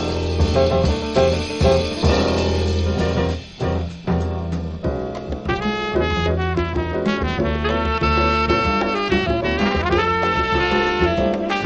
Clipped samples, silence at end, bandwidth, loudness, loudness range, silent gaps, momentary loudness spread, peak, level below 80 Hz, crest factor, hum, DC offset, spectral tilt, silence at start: under 0.1%; 0 s; 10.5 kHz; -20 LUFS; 5 LU; none; 7 LU; -4 dBFS; -28 dBFS; 16 dB; none; under 0.1%; -6 dB/octave; 0 s